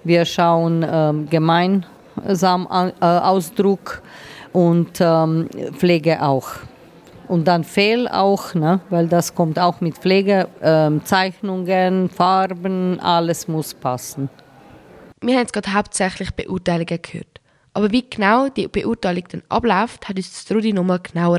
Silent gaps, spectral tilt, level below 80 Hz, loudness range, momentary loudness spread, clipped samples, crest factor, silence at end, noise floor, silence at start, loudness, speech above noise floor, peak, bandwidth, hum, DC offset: none; -6 dB/octave; -50 dBFS; 5 LU; 11 LU; under 0.1%; 16 dB; 0 s; -44 dBFS; 0.05 s; -18 LUFS; 27 dB; -2 dBFS; 15.5 kHz; none; under 0.1%